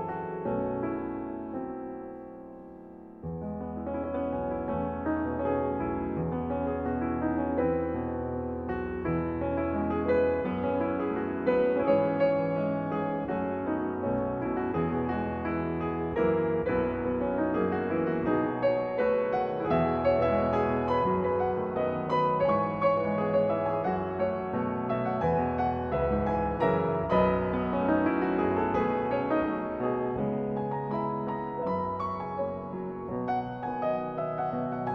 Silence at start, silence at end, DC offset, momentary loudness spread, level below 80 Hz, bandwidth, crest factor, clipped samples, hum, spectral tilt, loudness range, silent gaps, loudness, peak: 0 s; 0 s; under 0.1%; 8 LU; -50 dBFS; 6 kHz; 18 dB; under 0.1%; none; -10 dB/octave; 5 LU; none; -29 LUFS; -12 dBFS